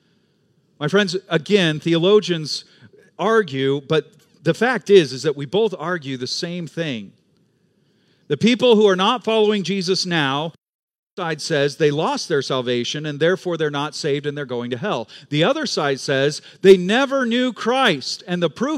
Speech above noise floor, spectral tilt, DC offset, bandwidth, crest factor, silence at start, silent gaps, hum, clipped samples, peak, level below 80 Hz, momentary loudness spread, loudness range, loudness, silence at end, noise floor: 43 dB; -5 dB/octave; under 0.1%; 12 kHz; 20 dB; 0.8 s; 10.69-10.88 s, 10.98-11.17 s; none; under 0.1%; 0 dBFS; -70 dBFS; 11 LU; 4 LU; -19 LUFS; 0 s; -62 dBFS